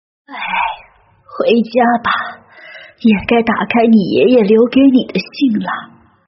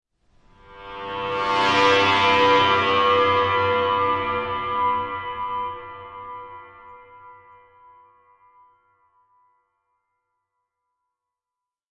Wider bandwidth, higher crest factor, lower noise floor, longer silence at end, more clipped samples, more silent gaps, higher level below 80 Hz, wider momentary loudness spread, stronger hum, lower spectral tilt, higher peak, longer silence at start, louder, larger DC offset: second, 5.8 kHz vs 9.6 kHz; about the same, 14 dB vs 18 dB; second, -46 dBFS vs -88 dBFS; second, 0.45 s vs 4.65 s; neither; neither; first, -48 dBFS vs -58 dBFS; second, 13 LU vs 21 LU; neither; about the same, -4.5 dB/octave vs -4 dB/octave; first, 0 dBFS vs -6 dBFS; second, 0.3 s vs 0.7 s; first, -13 LUFS vs -20 LUFS; neither